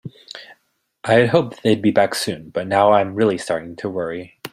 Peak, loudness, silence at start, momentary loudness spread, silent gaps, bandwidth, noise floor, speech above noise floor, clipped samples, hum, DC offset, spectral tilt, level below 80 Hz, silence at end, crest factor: -2 dBFS; -18 LUFS; 0.05 s; 17 LU; none; 16 kHz; -68 dBFS; 50 dB; under 0.1%; none; under 0.1%; -5.5 dB/octave; -58 dBFS; 0.05 s; 18 dB